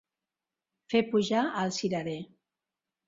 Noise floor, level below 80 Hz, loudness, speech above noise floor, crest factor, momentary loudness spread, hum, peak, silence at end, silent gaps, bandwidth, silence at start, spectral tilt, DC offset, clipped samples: -90 dBFS; -72 dBFS; -29 LUFS; 61 dB; 20 dB; 12 LU; none; -12 dBFS; 0.85 s; none; 7.8 kHz; 0.9 s; -5 dB/octave; under 0.1%; under 0.1%